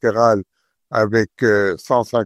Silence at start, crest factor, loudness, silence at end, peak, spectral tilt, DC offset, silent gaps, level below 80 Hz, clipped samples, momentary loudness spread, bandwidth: 0.05 s; 16 dB; -18 LUFS; 0 s; -2 dBFS; -6 dB/octave; under 0.1%; none; -54 dBFS; under 0.1%; 5 LU; 13.5 kHz